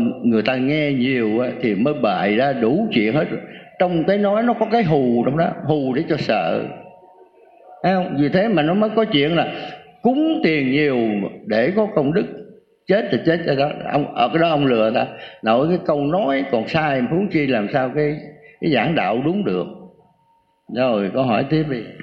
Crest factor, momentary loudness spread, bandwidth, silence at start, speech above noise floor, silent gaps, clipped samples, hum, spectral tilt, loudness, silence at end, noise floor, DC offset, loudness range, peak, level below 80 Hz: 16 dB; 7 LU; 6.4 kHz; 0 s; 42 dB; none; under 0.1%; none; -8.5 dB/octave; -19 LUFS; 0 s; -61 dBFS; under 0.1%; 3 LU; -4 dBFS; -54 dBFS